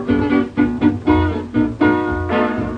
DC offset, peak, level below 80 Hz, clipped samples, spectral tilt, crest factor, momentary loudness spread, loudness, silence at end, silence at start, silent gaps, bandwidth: under 0.1%; -2 dBFS; -34 dBFS; under 0.1%; -8.5 dB/octave; 14 dB; 3 LU; -17 LUFS; 0 s; 0 s; none; 6 kHz